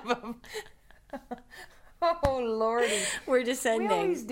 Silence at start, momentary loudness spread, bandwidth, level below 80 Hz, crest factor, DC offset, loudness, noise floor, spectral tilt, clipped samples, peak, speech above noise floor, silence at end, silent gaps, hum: 0 s; 18 LU; 16 kHz; -52 dBFS; 18 dB; under 0.1%; -28 LUFS; -50 dBFS; -3.5 dB/octave; under 0.1%; -12 dBFS; 21 dB; 0 s; none; none